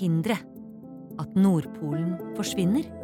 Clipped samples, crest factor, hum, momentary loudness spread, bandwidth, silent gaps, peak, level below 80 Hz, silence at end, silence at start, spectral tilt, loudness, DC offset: under 0.1%; 14 dB; none; 21 LU; 16.5 kHz; none; -12 dBFS; -60 dBFS; 0 s; 0 s; -6.5 dB/octave; -27 LUFS; under 0.1%